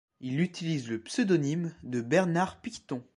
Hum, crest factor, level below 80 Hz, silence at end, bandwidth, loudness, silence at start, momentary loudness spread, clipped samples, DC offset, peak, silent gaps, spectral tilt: none; 18 dB; -66 dBFS; 0.15 s; 11.5 kHz; -30 LUFS; 0.2 s; 10 LU; under 0.1%; under 0.1%; -12 dBFS; none; -6 dB/octave